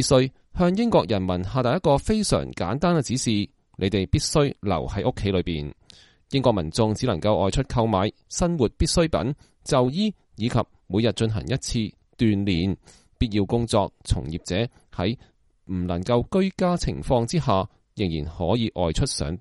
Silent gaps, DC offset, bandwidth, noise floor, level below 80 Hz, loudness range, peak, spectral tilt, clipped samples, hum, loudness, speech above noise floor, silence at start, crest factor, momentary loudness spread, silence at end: none; under 0.1%; 11.5 kHz; -53 dBFS; -38 dBFS; 3 LU; -4 dBFS; -5.5 dB/octave; under 0.1%; none; -24 LUFS; 30 dB; 0 s; 18 dB; 7 LU; 0 s